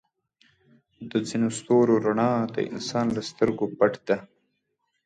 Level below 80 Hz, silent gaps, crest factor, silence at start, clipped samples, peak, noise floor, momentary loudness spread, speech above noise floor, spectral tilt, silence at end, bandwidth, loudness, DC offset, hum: -62 dBFS; none; 18 dB; 1 s; under 0.1%; -8 dBFS; -76 dBFS; 8 LU; 52 dB; -6 dB/octave; 0.8 s; 9.4 kHz; -25 LUFS; under 0.1%; none